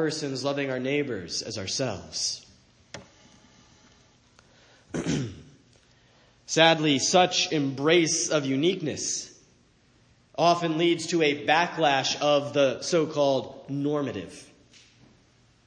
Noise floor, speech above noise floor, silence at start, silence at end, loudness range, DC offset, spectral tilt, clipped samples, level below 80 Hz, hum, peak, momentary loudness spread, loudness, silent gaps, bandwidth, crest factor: -61 dBFS; 36 dB; 0 s; 1.25 s; 14 LU; under 0.1%; -3.5 dB/octave; under 0.1%; -64 dBFS; none; -6 dBFS; 15 LU; -25 LUFS; none; 10 kHz; 22 dB